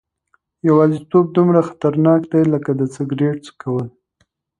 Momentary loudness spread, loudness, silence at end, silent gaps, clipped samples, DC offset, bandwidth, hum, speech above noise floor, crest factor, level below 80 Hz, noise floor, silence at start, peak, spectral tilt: 10 LU; -17 LUFS; 0.7 s; none; under 0.1%; under 0.1%; 10 kHz; none; 49 dB; 16 dB; -60 dBFS; -65 dBFS; 0.65 s; 0 dBFS; -9 dB/octave